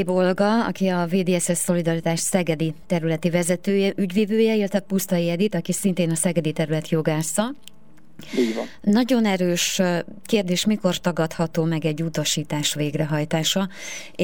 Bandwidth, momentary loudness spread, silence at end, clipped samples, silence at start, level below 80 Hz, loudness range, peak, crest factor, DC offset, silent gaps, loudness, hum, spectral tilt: 19.5 kHz; 5 LU; 0 s; under 0.1%; 0 s; -58 dBFS; 2 LU; -6 dBFS; 16 dB; 0.9%; none; -22 LUFS; none; -5 dB/octave